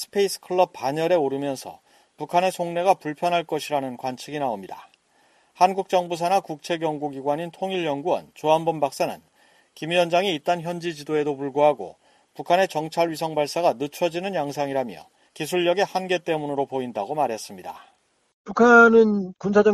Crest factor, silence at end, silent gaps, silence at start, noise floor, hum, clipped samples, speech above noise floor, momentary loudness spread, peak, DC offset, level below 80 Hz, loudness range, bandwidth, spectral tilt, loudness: 20 dB; 0 s; 18.34-18.45 s; 0 s; -61 dBFS; none; under 0.1%; 39 dB; 12 LU; -4 dBFS; under 0.1%; -66 dBFS; 5 LU; 14.5 kHz; -5 dB/octave; -23 LUFS